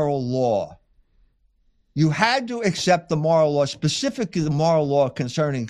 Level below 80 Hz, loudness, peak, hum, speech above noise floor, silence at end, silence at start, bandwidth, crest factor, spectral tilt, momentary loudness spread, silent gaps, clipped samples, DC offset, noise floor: -56 dBFS; -21 LUFS; -2 dBFS; none; 42 dB; 0 s; 0 s; 11.5 kHz; 18 dB; -5.5 dB/octave; 6 LU; none; under 0.1%; under 0.1%; -63 dBFS